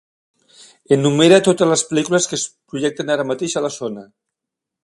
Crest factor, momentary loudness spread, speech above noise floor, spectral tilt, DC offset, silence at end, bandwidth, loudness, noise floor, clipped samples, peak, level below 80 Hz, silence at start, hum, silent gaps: 18 dB; 14 LU; 66 dB; -4 dB/octave; under 0.1%; 0.8 s; 11.5 kHz; -17 LUFS; -83 dBFS; under 0.1%; 0 dBFS; -62 dBFS; 0.9 s; none; none